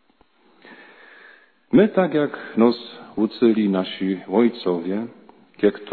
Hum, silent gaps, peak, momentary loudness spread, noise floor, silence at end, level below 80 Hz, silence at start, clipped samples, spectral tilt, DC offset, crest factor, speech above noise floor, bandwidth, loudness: none; none; -2 dBFS; 10 LU; -59 dBFS; 0 s; -62 dBFS; 0.7 s; under 0.1%; -10.5 dB/octave; under 0.1%; 18 dB; 40 dB; 4.6 kHz; -21 LUFS